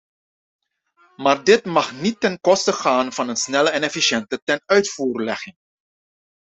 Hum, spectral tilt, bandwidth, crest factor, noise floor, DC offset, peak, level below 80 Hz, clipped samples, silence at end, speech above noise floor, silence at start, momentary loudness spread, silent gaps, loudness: none; -3 dB/octave; 8.2 kHz; 20 dB; -60 dBFS; under 0.1%; -2 dBFS; -64 dBFS; under 0.1%; 0.95 s; 41 dB; 1.2 s; 8 LU; 4.42-4.47 s; -19 LUFS